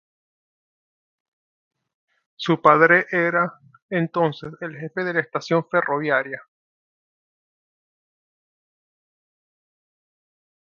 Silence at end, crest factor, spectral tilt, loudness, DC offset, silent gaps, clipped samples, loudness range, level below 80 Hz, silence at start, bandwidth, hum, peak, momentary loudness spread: 4.25 s; 24 dB; -6.5 dB/octave; -20 LUFS; under 0.1%; 3.82-3.89 s; under 0.1%; 8 LU; -70 dBFS; 2.4 s; 7.2 kHz; none; 0 dBFS; 17 LU